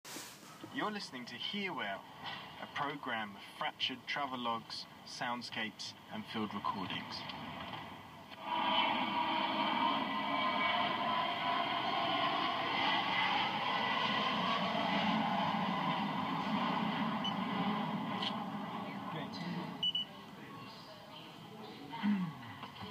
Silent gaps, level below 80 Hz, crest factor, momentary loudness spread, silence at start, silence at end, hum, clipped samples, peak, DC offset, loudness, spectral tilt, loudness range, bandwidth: none; -80 dBFS; 18 dB; 14 LU; 0.05 s; 0 s; none; under 0.1%; -18 dBFS; under 0.1%; -36 LUFS; -4.5 dB/octave; 8 LU; 15.5 kHz